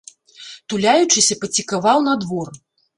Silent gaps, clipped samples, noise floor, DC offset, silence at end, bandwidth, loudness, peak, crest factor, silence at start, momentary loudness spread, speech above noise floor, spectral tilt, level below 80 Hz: none; under 0.1%; -41 dBFS; under 0.1%; 0.4 s; 11.5 kHz; -17 LUFS; -2 dBFS; 18 dB; 0.4 s; 18 LU; 23 dB; -2.5 dB/octave; -60 dBFS